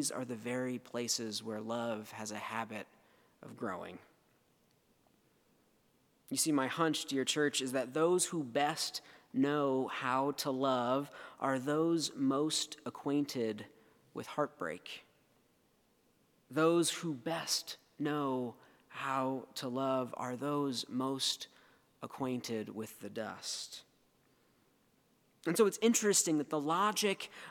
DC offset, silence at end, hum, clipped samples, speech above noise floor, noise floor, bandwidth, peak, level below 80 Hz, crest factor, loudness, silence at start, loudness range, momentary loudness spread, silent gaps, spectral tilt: under 0.1%; 0 s; none; under 0.1%; 37 dB; -72 dBFS; 19 kHz; -16 dBFS; -86 dBFS; 20 dB; -35 LUFS; 0 s; 10 LU; 14 LU; none; -3.5 dB/octave